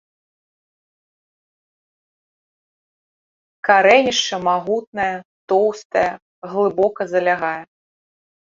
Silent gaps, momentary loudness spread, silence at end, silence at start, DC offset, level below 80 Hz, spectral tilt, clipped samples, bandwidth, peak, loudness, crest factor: 4.87-4.93 s, 5.25-5.48 s, 5.85-5.90 s, 6.22-6.42 s; 12 LU; 0.9 s; 3.65 s; under 0.1%; -62 dBFS; -3 dB/octave; under 0.1%; 7.6 kHz; -2 dBFS; -18 LUFS; 20 dB